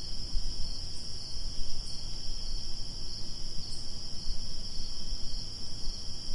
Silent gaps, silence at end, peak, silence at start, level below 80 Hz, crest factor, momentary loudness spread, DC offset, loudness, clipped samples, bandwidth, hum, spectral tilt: none; 0 s; -16 dBFS; 0 s; -36 dBFS; 12 dB; 1 LU; under 0.1%; -39 LUFS; under 0.1%; 11 kHz; none; -3 dB/octave